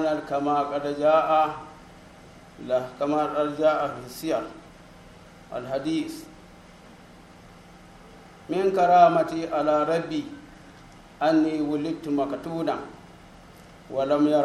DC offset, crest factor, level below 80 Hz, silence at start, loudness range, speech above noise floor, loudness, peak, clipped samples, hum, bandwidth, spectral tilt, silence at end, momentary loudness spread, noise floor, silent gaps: under 0.1%; 20 dB; -58 dBFS; 0 s; 12 LU; 25 dB; -24 LUFS; -4 dBFS; under 0.1%; none; 14 kHz; -6 dB/octave; 0 s; 20 LU; -49 dBFS; none